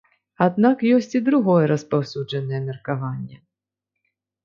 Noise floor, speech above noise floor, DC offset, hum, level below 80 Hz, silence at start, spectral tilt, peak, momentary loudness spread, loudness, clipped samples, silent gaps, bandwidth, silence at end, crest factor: -85 dBFS; 65 dB; under 0.1%; 50 Hz at -55 dBFS; -66 dBFS; 0.4 s; -8 dB/octave; -4 dBFS; 10 LU; -21 LUFS; under 0.1%; none; 7.2 kHz; 1.1 s; 18 dB